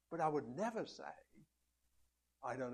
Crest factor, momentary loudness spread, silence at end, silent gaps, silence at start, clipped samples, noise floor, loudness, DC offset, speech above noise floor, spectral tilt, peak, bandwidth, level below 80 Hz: 20 dB; 14 LU; 0 s; none; 0.1 s; under 0.1%; -82 dBFS; -43 LUFS; under 0.1%; 40 dB; -6 dB/octave; -24 dBFS; 12.5 kHz; -80 dBFS